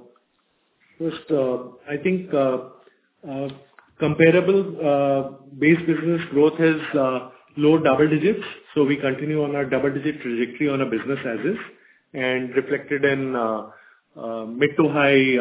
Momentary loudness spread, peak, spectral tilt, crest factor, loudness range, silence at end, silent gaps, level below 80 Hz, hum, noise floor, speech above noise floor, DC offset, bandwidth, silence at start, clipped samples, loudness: 14 LU; -2 dBFS; -10.5 dB/octave; 18 dB; 6 LU; 0 s; none; -62 dBFS; none; -67 dBFS; 47 dB; under 0.1%; 4 kHz; 1 s; under 0.1%; -21 LUFS